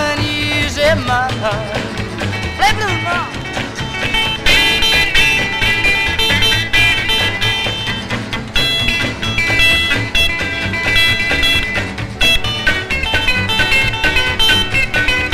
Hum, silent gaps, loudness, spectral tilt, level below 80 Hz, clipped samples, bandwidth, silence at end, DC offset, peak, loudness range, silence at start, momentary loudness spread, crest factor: none; none; -13 LUFS; -3 dB/octave; -26 dBFS; under 0.1%; 16 kHz; 0 s; under 0.1%; 0 dBFS; 5 LU; 0 s; 9 LU; 14 dB